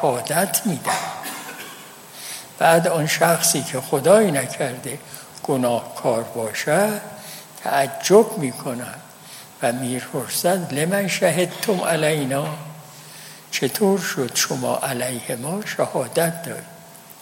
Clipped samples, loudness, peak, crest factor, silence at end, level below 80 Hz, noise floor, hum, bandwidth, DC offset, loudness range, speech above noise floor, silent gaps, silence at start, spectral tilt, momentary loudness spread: under 0.1%; -21 LUFS; -2 dBFS; 20 dB; 0 s; -68 dBFS; -41 dBFS; none; 17 kHz; under 0.1%; 4 LU; 21 dB; none; 0 s; -4 dB/octave; 20 LU